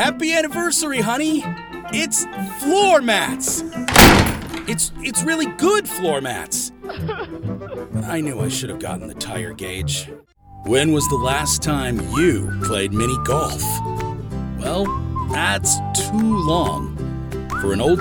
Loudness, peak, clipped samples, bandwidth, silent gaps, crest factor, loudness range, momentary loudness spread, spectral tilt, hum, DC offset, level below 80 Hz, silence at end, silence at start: -19 LUFS; 0 dBFS; under 0.1%; 19 kHz; none; 20 dB; 10 LU; 12 LU; -3.5 dB/octave; none; under 0.1%; -34 dBFS; 0 s; 0 s